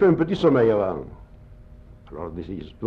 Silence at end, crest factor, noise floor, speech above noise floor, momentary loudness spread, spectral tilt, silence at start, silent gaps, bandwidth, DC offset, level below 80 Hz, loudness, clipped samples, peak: 0 s; 16 dB; -45 dBFS; 24 dB; 20 LU; -8.5 dB/octave; 0 s; none; 7.4 kHz; under 0.1%; -46 dBFS; -22 LUFS; under 0.1%; -6 dBFS